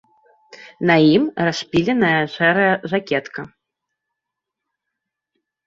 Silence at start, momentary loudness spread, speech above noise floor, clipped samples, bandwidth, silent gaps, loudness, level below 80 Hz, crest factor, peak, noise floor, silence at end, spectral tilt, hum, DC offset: 0.6 s; 11 LU; 65 dB; under 0.1%; 7.6 kHz; none; -17 LUFS; -58 dBFS; 18 dB; -2 dBFS; -82 dBFS; 2.2 s; -6 dB/octave; none; under 0.1%